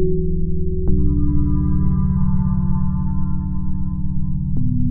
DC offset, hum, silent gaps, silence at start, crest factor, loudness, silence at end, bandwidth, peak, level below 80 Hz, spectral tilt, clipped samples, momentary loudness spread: under 0.1%; none; none; 0 s; 14 dB; -21 LUFS; 0 s; 1.7 kHz; -2 dBFS; -22 dBFS; -16 dB/octave; under 0.1%; 5 LU